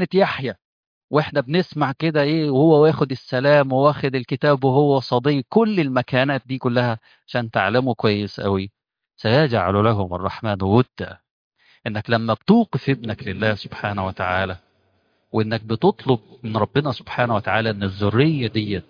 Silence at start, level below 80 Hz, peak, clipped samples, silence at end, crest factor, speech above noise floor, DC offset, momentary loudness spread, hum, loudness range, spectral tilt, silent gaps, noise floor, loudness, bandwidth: 0 s; -56 dBFS; -2 dBFS; under 0.1%; 0.05 s; 18 dB; 45 dB; under 0.1%; 10 LU; none; 5 LU; -8.5 dB/octave; 0.65-1.08 s, 11.31-11.51 s; -65 dBFS; -20 LUFS; 5.2 kHz